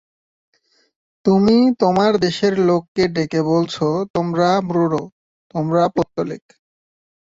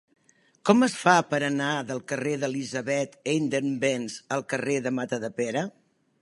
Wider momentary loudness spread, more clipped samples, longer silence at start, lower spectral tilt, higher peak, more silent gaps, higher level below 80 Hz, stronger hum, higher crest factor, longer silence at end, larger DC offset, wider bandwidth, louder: about the same, 11 LU vs 10 LU; neither; first, 1.25 s vs 0.65 s; first, -7 dB/octave vs -4.5 dB/octave; about the same, -2 dBFS vs -4 dBFS; first, 2.88-2.95 s, 4.10-4.14 s, 5.12-5.50 s vs none; first, -54 dBFS vs -74 dBFS; neither; second, 16 dB vs 22 dB; first, 1 s vs 0.5 s; neither; second, 7.8 kHz vs 11.5 kHz; first, -18 LUFS vs -26 LUFS